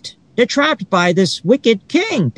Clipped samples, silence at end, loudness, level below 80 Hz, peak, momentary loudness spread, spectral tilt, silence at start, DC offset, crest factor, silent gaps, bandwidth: under 0.1%; 0.05 s; -15 LUFS; -62 dBFS; 0 dBFS; 3 LU; -5 dB/octave; 0.05 s; under 0.1%; 16 dB; none; 11 kHz